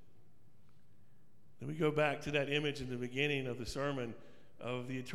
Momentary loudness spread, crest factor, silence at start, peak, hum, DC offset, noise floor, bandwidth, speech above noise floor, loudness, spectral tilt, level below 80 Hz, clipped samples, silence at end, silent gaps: 13 LU; 20 dB; 1.6 s; -18 dBFS; none; 0.3%; -69 dBFS; 14 kHz; 32 dB; -37 LUFS; -5.5 dB/octave; -62 dBFS; under 0.1%; 0 s; none